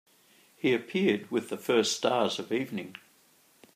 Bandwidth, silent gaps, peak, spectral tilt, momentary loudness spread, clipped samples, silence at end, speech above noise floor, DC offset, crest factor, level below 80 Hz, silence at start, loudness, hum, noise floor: 15.5 kHz; none; -10 dBFS; -4 dB/octave; 11 LU; under 0.1%; 0.8 s; 35 dB; under 0.1%; 20 dB; -80 dBFS; 0.65 s; -29 LUFS; none; -63 dBFS